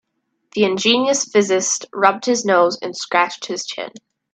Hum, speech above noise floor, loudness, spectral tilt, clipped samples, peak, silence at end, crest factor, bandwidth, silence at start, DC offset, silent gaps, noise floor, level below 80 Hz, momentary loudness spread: none; 40 dB; -17 LUFS; -2.5 dB/octave; under 0.1%; 0 dBFS; 0.35 s; 18 dB; 9.4 kHz; 0.55 s; under 0.1%; none; -58 dBFS; -68 dBFS; 11 LU